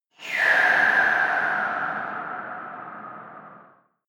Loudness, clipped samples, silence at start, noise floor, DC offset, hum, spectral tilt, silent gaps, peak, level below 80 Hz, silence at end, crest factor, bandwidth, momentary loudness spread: -21 LUFS; under 0.1%; 0.2 s; -55 dBFS; under 0.1%; none; -3 dB/octave; none; -8 dBFS; -78 dBFS; 0.45 s; 16 dB; 18.5 kHz; 21 LU